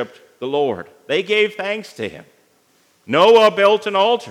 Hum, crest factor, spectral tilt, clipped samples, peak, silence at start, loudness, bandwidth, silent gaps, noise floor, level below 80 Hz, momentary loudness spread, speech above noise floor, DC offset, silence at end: none; 18 dB; -4 dB/octave; under 0.1%; 0 dBFS; 0 s; -16 LUFS; 12.5 kHz; none; -58 dBFS; -72 dBFS; 18 LU; 42 dB; under 0.1%; 0 s